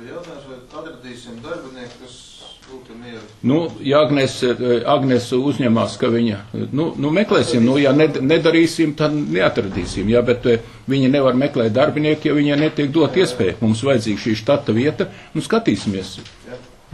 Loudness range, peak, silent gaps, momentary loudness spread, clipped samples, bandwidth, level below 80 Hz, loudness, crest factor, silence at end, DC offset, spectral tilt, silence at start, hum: 5 LU; -2 dBFS; none; 21 LU; under 0.1%; 12.5 kHz; -46 dBFS; -17 LUFS; 16 dB; 0.3 s; under 0.1%; -6 dB/octave; 0 s; none